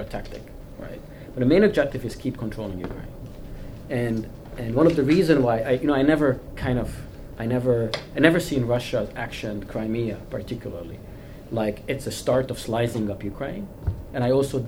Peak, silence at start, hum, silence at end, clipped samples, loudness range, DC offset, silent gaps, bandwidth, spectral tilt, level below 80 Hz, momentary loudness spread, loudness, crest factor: 0 dBFS; 0 s; none; 0 s; under 0.1%; 7 LU; under 0.1%; none; over 20 kHz; -6.5 dB/octave; -40 dBFS; 20 LU; -24 LUFS; 24 dB